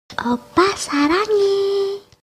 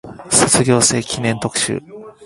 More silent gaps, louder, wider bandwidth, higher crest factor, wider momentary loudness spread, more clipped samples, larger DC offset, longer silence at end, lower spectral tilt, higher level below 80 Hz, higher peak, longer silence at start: neither; second, -18 LUFS vs -15 LUFS; second, 13.5 kHz vs 16 kHz; about the same, 16 dB vs 18 dB; about the same, 7 LU vs 9 LU; neither; neither; first, 0.35 s vs 0 s; about the same, -3.5 dB/octave vs -3 dB/octave; second, -52 dBFS vs -46 dBFS; about the same, -2 dBFS vs 0 dBFS; about the same, 0.1 s vs 0.05 s